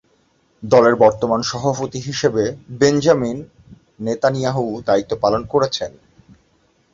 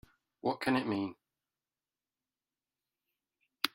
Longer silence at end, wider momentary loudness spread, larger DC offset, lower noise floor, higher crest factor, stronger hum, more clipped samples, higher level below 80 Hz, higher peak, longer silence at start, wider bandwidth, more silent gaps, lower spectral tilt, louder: first, 1.05 s vs 0.05 s; first, 12 LU vs 7 LU; neither; second, -60 dBFS vs under -90 dBFS; second, 18 dB vs 30 dB; neither; neither; first, -50 dBFS vs -76 dBFS; first, 0 dBFS vs -10 dBFS; first, 0.6 s vs 0.45 s; second, 7.8 kHz vs 15.5 kHz; neither; about the same, -5.5 dB/octave vs -5 dB/octave; first, -18 LUFS vs -35 LUFS